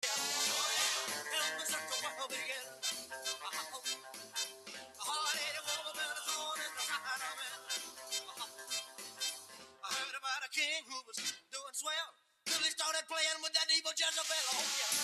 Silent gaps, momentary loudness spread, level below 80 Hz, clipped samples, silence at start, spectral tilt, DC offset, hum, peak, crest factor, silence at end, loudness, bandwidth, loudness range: none; 11 LU; -90 dBFS; under 0.1%; 0 s; 2 dB/octave; under 0.1%; none; -18 dBFS; 20 dB; 0 s; -36 LUFS; 15.5 kHz; 6 LU